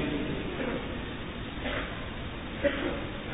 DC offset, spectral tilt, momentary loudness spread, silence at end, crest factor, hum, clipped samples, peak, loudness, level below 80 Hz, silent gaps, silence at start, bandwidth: under 0.1%; -3.5 dB/octave; 8 LU; 0 s; 20 dB; none; under 0.1%; -12 dBFS; -34 LUFS; -44 dBFS; none; 0 s; 3.9 kHz